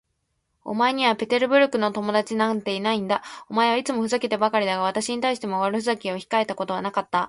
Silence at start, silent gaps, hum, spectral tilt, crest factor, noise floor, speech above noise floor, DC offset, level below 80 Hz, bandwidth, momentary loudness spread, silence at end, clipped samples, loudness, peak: 0.65 s; none; none; -4 dB/octave; 18 dB; -74 dBFS; 51 dB; under 0.1%; -68 dBFS; 11.5 kHz; 7 LU; 0 s; under 0.1%; -23 LUFS; -6 dBFS